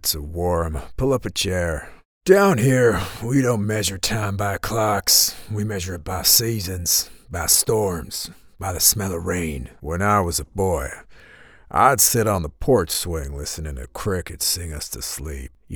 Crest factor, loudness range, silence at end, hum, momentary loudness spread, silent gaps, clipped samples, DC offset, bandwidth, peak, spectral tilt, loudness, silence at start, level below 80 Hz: 22 dB; 4 LU; 0 s; none; 14 LU; 2.05-2.21 s; under 0.1%; under 0.1%; over 20 kHz; 0 dBFS; -3.5 dB/octave; -20 LUFS; 0.05 s; -38 dBFS